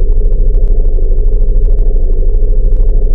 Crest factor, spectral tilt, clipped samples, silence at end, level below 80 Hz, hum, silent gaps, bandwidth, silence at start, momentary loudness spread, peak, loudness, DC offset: 6 dB; -12.5 dB/octave; under 0.1%; 0 s; -6 dBFS; none; none; 0.9 kHz; 0 s; 1 LU; 0 dBFS; -15 LUFS; under 0.1%